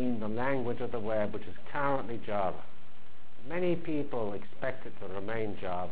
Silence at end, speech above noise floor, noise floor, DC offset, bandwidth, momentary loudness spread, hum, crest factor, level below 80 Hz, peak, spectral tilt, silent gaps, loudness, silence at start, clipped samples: 0 s; 24 dB; -59 dBFS; 4%; 4 kHz; 9 LU; none; 20 dB; -58 dBFS; -18 dBFS; -10 dB/octave; none; -35 LUFS; 0 s; under 0.1%